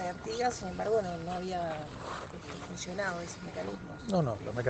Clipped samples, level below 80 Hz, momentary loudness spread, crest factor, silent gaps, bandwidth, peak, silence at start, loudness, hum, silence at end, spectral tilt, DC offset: under 0.1%; -56 dBFS; 10 LU; 18 dB; none; 9 kHz; -16 dBFS; 0 s; -35 LUFS; none; 0 s; -5.5 dB/octave; under 0.1%